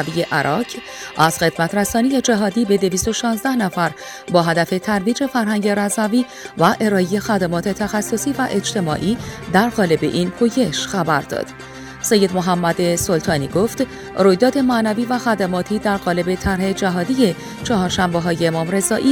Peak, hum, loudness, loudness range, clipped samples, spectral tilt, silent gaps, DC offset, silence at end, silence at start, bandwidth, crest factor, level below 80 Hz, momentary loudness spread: 0 dBFS; none; -18 LUFS; 1 LU; under 0.1%; -4.5 dB/octave; none; under 0.1%; 0 s; 0 s; 19.5 kHz; 18 dB; -44 dBFS; 6 LU